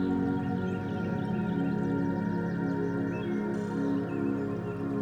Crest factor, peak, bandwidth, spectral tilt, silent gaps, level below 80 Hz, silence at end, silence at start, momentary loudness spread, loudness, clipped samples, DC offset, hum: 12 dB; -18 dBFS; 8.8 kHz; -9 dB/octave; none; -58 dBFS; 0 s; 0 s; 3 LU; -31 LUFS; under 0.1%; under 0.1%; none